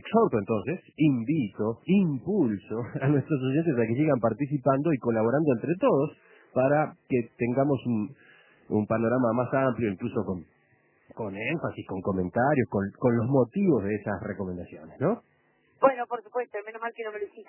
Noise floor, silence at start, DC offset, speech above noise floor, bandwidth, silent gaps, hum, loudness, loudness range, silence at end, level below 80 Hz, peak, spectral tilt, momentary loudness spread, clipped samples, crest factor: -66 dBFS; 0.05 s; under 0.1%; 40 dB; 3.2 kHz; none; none; -27 LUFS; 4 LU; 0.05 s; -58 dBFS; -6 dBFS; -12 dB/octave; 10 LU; under 0.1%; 20 dB